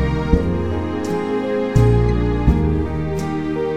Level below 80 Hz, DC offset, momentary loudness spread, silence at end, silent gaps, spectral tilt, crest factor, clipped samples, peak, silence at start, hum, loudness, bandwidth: -24 dBFS; 1%; 7 LU; 0 s; none; -8.5 dB/octave; 16 dB; under 0.1%; -2 dBFS; 0 s; none; -19 LUFS; 10 kHz